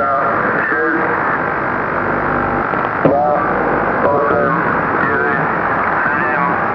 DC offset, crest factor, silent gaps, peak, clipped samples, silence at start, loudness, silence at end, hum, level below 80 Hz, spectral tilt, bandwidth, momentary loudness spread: 0.1%; 16 dB; none; 0 dBFS; under 0.1%; 0 s; -15 LUFS; 0 s; none; -42 dBFS; -9 dB/octave; 5.4 kHz; 3 LU